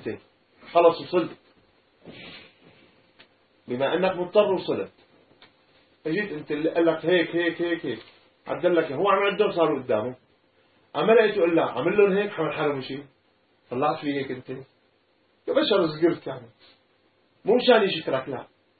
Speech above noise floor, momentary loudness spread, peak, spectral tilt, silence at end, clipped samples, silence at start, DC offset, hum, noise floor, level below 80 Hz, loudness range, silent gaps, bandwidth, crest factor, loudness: 42 dB; 17 LU; -6 dBFS; -10 dB/octave; 0.35 s; under 0.1%; 0 s; under 0.1%; none; -65 dBFS; -70 dBFS; 5 LU; none; 4.8 kHz; 20 dB; -24 LUFS